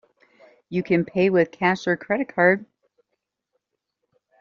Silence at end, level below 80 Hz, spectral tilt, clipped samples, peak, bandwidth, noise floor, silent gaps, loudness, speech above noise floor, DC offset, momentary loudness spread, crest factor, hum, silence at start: 1.75 s; -64 dBFS; -5 dB/octave; under 0.1%; -4 dBFS; 7.2 kHz; -79 dBFS; none; -22 LUFS; 58 dB; under 0.1%; 7 LU; 20 dB; none; 0.7 s